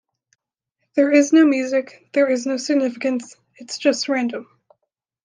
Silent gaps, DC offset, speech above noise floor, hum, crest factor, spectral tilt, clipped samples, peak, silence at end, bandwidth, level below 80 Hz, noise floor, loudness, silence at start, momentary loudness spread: none; under 0.1%; 58 dB; none; 18 dB; -3 dB/octave; under 0.1%; -2 dBFS; 0.8 s; 9.8 kHz; -76 dBFS; -77 dBFS; -19 LUFS; 0.95 s; 12 LU